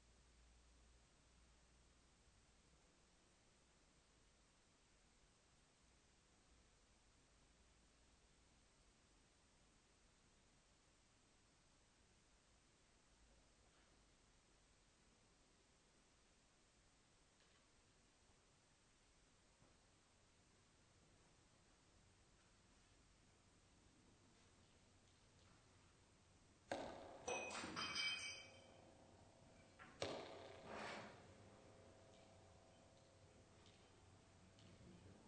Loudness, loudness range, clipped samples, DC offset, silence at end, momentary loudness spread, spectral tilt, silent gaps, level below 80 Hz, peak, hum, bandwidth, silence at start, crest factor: -50 LUFS; 18 LU; under 0.1%; under 0.1%; 0 s; 23 LU; -2.5 dB/octave; none; -80 dBFS; -30 dBFS; none; 9 kHz; 0 s; 32 dB